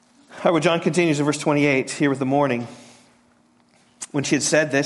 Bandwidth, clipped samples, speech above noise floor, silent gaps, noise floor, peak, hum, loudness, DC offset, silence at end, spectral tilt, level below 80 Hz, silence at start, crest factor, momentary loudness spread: 11.5 kHz; under 0.1%; 39 dB; none; -59 dBFS; -4 dBFS; none; -20 LUFS; under 0.1%; 0 s; -4.5 dB/octave; -66 dBFS; 0.3 s; 18 dB; 9 LU